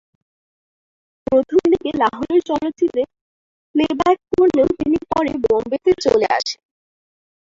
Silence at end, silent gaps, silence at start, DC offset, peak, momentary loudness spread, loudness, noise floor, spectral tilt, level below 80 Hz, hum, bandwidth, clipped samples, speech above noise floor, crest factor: 0.85 s; 3.21-3.74 s; 1.3 s; under 0.1%; -2 dBFS; 8 LU; -18 LUFS; under -90 dBFS; -5 dB/octave; -48 dBFS; none; 7.6 kHz; under 0.1%; over 73 dB; 16 dB